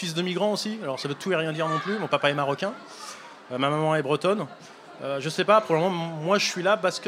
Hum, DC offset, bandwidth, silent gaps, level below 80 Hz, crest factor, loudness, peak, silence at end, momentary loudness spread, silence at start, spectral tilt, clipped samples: none; under 0.1%; 15.5 kHz; none; -78 dBFS; 20 dB; -25 LUFS; -4 dBFS; 0 s; 17 LU; 0 s; -4.5 dB/octave; under 0.1%